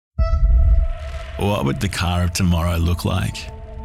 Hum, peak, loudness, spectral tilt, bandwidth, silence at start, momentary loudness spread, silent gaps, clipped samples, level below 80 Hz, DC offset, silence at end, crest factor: none; -8 dBFS; -20 LUFS; -5.5 dB/octave; 15.5 kHz; 0.2 s; 12 LU; none; under 0.1%; -22 dBFS; under 0.1%; 0 s; 12 dB